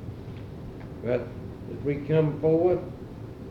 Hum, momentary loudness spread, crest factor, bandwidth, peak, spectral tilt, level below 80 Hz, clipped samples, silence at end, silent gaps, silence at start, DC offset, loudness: none; 17 LU; 18 dB; 6.4 kHz; -10 dBFS; -9.5 dB/octave; -50 dBFS; under 0.1%; 0 s; none; 0 s; under 0.1%; -27 LUFS